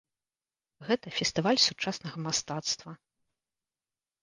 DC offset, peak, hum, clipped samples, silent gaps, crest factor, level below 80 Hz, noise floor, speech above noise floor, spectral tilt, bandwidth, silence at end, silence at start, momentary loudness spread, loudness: under 0.1%; -8 dBFS; none; under 0.1%; none; 24 dB; -68 dBFS; under -90 dBFS; over 59 dB; -3 dB/octave; 10.5 kHz; 1.25 s; 0.8 s; 12 LU; -29 LUFS